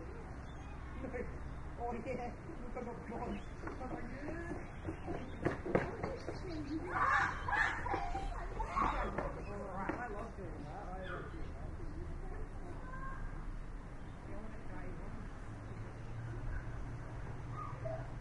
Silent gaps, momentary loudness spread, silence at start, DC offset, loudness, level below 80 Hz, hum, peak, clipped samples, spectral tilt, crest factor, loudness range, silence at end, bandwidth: none; 13 LU; 0 s; under 0.1%; -42 LUFS; -48 dBFS; none; -16 dBFS; under 0.1%; -6.5 dB/octave; 24 dB; 12 LU; 0 s; 11 kHz